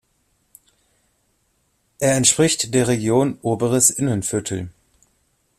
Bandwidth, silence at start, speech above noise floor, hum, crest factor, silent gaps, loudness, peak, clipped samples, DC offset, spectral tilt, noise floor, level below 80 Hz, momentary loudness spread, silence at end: 15.5 kHz; 2 s; 48 dB; none; 20 dB; none; -18 LUFS; -2 dBFS; under 0.1%; under 0.1%; -4 dB/octave; -66 dBFS; -54 dBFS; 10 LU; 0.9 s